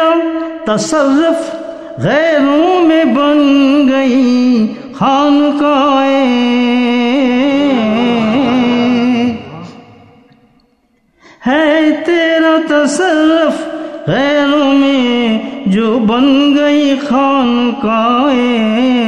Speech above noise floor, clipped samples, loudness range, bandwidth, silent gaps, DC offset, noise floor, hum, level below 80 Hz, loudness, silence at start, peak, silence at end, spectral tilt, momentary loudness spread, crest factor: 46 dB; under 0.1%; 5 LU; 10 kHz; none; 0.3%; -56 dBFS; none; -50 dBFS; -11 LUFS; 0 s; 0 dBFS; 0 s; -5 dB/octave; 7 LU; 10 dB